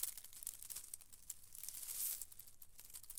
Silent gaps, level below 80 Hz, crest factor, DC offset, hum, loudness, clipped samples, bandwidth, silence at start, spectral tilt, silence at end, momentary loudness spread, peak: none; -72 dBFS; 28 dB; under 0.1%; none; -47 LUFS; under 0.1%; 18 kHz; 0 s; 1.5 dB/octave; 0 s; 14 LU; -22 dBFS